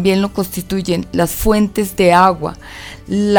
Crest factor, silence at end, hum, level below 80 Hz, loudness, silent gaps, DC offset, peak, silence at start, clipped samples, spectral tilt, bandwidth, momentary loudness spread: 14 dB; 0 s; none; -32 dBFS; -15 LUFS; none; under 0.1%; 0 dBFS; 0 s; 0.2%; -5.5 dB/octave; over 20 kHz; 15 LU